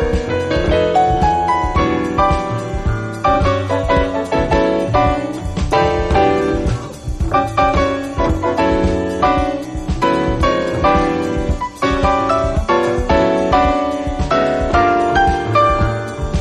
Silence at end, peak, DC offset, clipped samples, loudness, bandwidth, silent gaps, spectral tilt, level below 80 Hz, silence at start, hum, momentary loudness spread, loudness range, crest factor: 0 s; -4 dBFS; under 0.1%; under 0.1%; -16 LUFS; 12 kHz; none; -6.5 dB/octave; -24 dBFS; 0 s; none; 7 LU; 2 LU; 12 dB